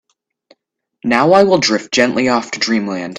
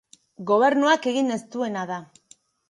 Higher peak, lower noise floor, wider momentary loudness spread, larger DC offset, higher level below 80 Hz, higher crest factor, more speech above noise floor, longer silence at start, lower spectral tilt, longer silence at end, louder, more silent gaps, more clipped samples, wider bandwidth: first, 0 dBFS vs -6 dBFS; first, -63 dBFS vs -57 dBFS; second, 7 LU vs 15 LU; neither; first, -56 dBFS vs -76 dBFS; about the same, 16 dB vs 18 dB; first, 49 dB vs 35 dB; first, 1.05 s vs 0.4 s; about the same, -4 dB/octave vs -4.5 dB/octave; second, 0 s vs 0.65 s; first, -13 LUFS vs -22 LUFS; neither; neither; about the same, 10.5 kHz vs 11.5 kHz